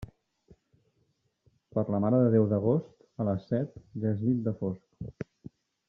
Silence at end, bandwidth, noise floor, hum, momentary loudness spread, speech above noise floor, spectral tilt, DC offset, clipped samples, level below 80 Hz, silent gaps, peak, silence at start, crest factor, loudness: 0.65 s; 5.6 kHz; -74 dBFS; none; 19 LU; 46 dB; -11.5 dB/octave; under 0.1%; under 0.1%; -62 dBFS; none; -12 dBFS; 0 s; 20 dB; -29 LUFS